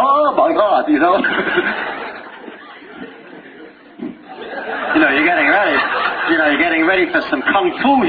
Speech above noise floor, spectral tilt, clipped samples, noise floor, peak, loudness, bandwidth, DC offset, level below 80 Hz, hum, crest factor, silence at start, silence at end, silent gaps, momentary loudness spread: 25 dB; -7 dB/octave; under 0.1%; -39 dBFS; 0 dBFS; -14 LUFS; 5 kHz; under 0.1%; -54 dBFS; none; 16 dB; 0 s; 0 s; none; 21 LU